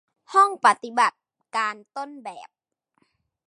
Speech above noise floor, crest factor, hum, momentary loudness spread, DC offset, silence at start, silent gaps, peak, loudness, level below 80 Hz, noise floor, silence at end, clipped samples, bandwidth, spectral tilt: 48 dB; 22 dB; none; 18 LU; under 0.1%; 0.3 s; none; -2 dBFS; -22 LUFS; -88 dBFS; -70 dBFS; 1 s; under 0.1%; 11 kHz; -1.5 dB/octave